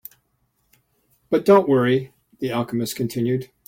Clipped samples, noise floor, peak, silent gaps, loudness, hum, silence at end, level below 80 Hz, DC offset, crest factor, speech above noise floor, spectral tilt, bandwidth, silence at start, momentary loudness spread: under 0.1%; -69 dBFS; -4 dBFS; none; -20 LUFS; none; 0.2 s; -60 dBFS; under 0.1%; 18 dB; 49 dB; -6.5 dB/octave; 16.5 kHz; 1.3 s; 11 LU